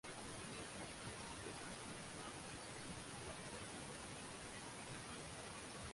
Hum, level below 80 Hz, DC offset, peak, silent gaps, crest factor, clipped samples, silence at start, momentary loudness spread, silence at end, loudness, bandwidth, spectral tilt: none; -66 dBFS; under 0.1%; -38 dBFS; none; 14 dB; under 0.1%; 0.05 s; 1 LU; 0 s; -51 LUFS; 11.5 kHz; -3 dB/octave